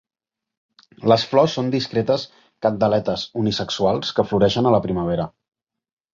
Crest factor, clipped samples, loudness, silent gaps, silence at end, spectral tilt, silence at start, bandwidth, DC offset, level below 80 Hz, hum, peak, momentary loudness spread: 18 dB; under 0.1%; -20 LUFS; none; 0.85 s; -6 dB/octave; 1 s; 7.6 kHz; under 0.1%; -50 dBFS; none; -2 dBFS; 8 LU